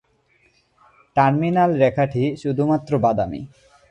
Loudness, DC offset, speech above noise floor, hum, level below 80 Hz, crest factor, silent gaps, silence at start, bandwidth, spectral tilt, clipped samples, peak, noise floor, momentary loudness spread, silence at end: -20 LUFS; under 0.1%; 42 dB; none; -52 dBFS; 18 dB; none; 1.15 s; 8.8 kHz; -8.5 dB/octave; under 0.1%; -2 dBFS; -61 dBFS; 9 LU; 0.45 s